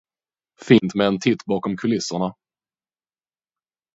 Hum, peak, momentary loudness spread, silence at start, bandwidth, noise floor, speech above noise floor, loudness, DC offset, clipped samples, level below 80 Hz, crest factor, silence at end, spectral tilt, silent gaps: none; 0 dBFS; 9 LU; 0.6 s; 8 kHz; under -90 dBFS; over 70 dB; -21 LUFS; under 0.1%; under 0.1%; -60 dBFS; 22 dB; 1.65 s; -5.5 dB/octave; none